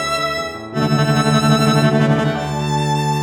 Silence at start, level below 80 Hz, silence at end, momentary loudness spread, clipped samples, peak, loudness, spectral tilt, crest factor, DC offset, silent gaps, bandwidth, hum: 0 s; -44 dBFS; 0 s; 7 LU; under 0.1%; -2 dBFS; -16 LUFS; -5.5 dB/octave; 14 dB; under 0.1%; none; 15.5 kHz; none